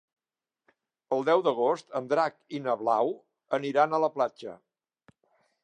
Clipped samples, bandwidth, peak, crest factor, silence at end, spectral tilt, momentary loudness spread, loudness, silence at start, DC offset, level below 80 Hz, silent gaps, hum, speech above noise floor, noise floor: under 0.1%; 9.4 kHz; -10 dBFS; 20 dB; 1.1 s; -6 dB/octave; 9 LU; -28 LUFS; 1.1 s; under 0.1%; -86 dBFS; none; none; over 63 dB; under -90 dBFS